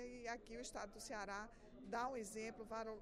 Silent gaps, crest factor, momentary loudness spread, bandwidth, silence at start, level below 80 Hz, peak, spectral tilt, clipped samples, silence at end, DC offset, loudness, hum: none; 18 dB; 6 LU; 15.5 kHz; 0 s; -66 dBFS; -32 dBFS; -3 dB/octave; under 0.1%; 0 s; under 0.1%; -49 LUFS; none